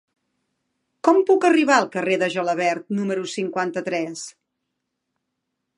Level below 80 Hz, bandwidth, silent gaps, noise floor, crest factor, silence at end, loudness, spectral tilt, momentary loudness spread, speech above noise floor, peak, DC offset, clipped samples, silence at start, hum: -78 dBFS; 11 kHz; none; -79 dBFS; 20 dB; 1.5 s; -21 LUFS; -4.5 dB/octave; 10 LU; 58 dB; -2 dBFS; under 0.1%; under 0.1%; 1.05 s; none